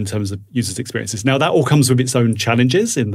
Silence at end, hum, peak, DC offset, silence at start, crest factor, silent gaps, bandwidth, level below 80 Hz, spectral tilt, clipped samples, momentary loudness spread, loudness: 0 s; none; -2 dBFS; under 0.1%; 0 s; 14 dB; none; 15.5 kHz; -54 dBFS; -5 dB/octave; under 0.1%; 9 LU; -17 LUFS